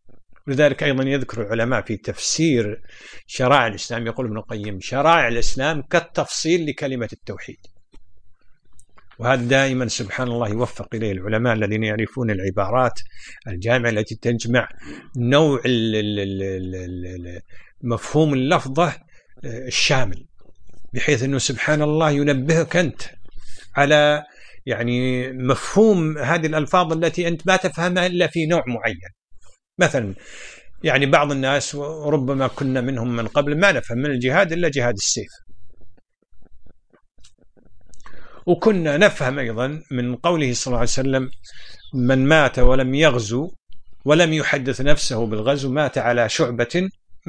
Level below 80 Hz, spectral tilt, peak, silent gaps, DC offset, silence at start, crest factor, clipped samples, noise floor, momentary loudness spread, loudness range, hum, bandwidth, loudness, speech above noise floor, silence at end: -36 dBFS; -5 dB/octave; 0 dBFS; 43.60-43.64 s; under 0.1%; 0.05 s; 20 dB; under 0.1%; -49 dBFS; 14 LU; 4 LU; none; 10.5 kHz; -20 LUFS; 30 dB; 0.1 s